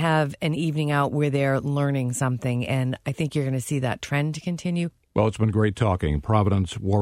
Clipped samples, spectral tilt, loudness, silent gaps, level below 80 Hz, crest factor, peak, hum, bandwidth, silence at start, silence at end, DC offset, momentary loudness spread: under 0.1%; -6.5 dB/octave; -24 LUFS; none; -44 dBFS; 18 dB; -4 dBFS; none; 15 kHz; 0 s; 0 s; under 0.1%; 5 LU